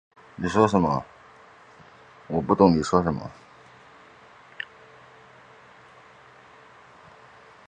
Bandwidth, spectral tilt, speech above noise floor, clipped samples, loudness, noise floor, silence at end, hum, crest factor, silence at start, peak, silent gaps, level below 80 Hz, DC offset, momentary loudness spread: 9.6 kHz; -7 dB/octave; 30 dB; under 0.1%; -23 LUFS; -51 dBFS; 4.35 s; none; 26 dB; 0.4 s; -2 dBFS; none; -52 dBFS; under 0.1%; 21 LU